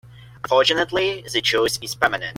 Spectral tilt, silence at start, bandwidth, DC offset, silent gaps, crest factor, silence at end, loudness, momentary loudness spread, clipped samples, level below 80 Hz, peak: -2.5 dB/octave; 0.05 s; 16.5 kHz; under 0.1%; none; 18 dB; 0 s; -20 LUFS; 6 LU; under 0.1%; -52 dBFS; -2 dBFS